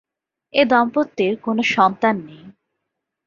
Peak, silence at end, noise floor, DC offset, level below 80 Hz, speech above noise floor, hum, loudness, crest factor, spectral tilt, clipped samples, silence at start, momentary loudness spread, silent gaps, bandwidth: -2 dBFS; 0.75 s; -79 dBFS; under 0.1%; -64 dBFS; 61 dB; none; -18 LUFS; 18 dB; -5.5 dB/octave; under 0.1%; 0.55 s; 6 LU; none; 7.4 kHz